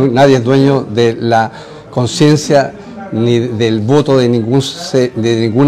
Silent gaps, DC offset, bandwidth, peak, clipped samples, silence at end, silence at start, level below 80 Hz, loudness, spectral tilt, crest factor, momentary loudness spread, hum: none; under 0.1%; 13 kHz; 0 dBFS; under 0.1%; 0 s; 0 s; -48 dBFS; -12 LUFS; -6 dB/octave; 12 dB; 10 LU; none